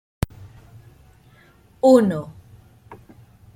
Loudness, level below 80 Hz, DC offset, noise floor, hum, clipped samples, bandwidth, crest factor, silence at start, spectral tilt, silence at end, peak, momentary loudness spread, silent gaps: -19 LUFS; -46 dBFS; under 0.1%; -53 dBFS; none; under 0.1%; 15.5 kHz; 22 dB; 0.4 s; -7.5 dB/octave; 0.6 s; -2 dBFS; 16 LU; none